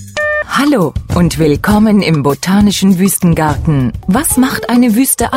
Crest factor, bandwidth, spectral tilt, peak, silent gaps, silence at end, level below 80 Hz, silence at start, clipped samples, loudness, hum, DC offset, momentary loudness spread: 10 dB; 16.5 kHz; -5 dB/octave; 0 dBFS; none; 0 s; -28 dBFS; 0 s; under 0.1%; -11 LUFS; none; under 0.1%; 4 LU